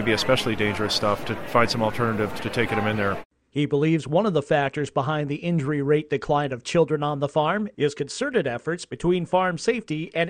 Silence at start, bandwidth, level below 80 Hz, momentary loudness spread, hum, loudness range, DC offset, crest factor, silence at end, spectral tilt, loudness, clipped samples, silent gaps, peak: 0 s; 16 kHz; -50 dBFS; 6 LU; none; 1 LU; under 0.1%; 20 dB; 0 s; -5.5 dB/octave; -24 LUFS; under 0.1%; 3.25-3.30 s; -4 dBFS